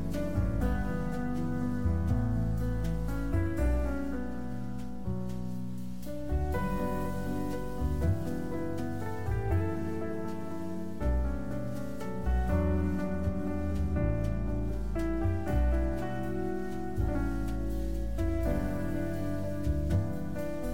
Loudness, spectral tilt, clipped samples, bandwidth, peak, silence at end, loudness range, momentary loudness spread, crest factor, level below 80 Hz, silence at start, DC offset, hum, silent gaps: -33 LUFS; -8 dB/octave; under 0.1%; 17 kHz; -18 dBFS; 0 s; 3 LU; 7 LU; 14 dB; -36 dBFS; 0 s; 1%; none; none